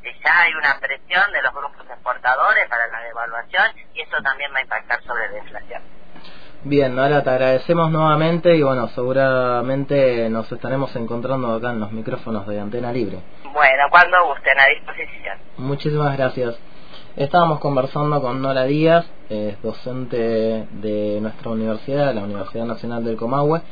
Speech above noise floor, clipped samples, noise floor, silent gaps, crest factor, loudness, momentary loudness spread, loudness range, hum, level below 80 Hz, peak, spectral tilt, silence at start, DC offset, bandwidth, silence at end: 24 dB; under 0.1%; -43 dBFS; none; 20 dB; -19 LUFS; 14 LU; 7 LU; none; -50 dBFS; 0 dBFS; -8.5 dB/octave; 0 s; 3%; 5.4 kHz; 0 s